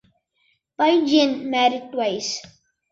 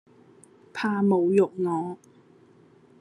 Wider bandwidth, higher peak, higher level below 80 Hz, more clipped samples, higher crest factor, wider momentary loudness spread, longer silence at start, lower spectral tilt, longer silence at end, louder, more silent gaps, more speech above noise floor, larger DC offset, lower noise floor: second, 7.8 kHz vs 10.5 kHz; first, -4 dBFS vs -10 dBFS; first, -68 dBFS vs -74 dBFS; neither; about the same, 18 dB vs 18 dB; second, 10 LU vs 17 LU; about the same, 0.8 s vs 0.75 s; second, -3 dB/octave vs -8 dB/octave; second, 0.5 s vs 1.05 s; first, -20 LUFS vs -25 LUFS; neither; first, 47 dB vs 32 dB; neither; first, -67 dBFS vs -56 dBFS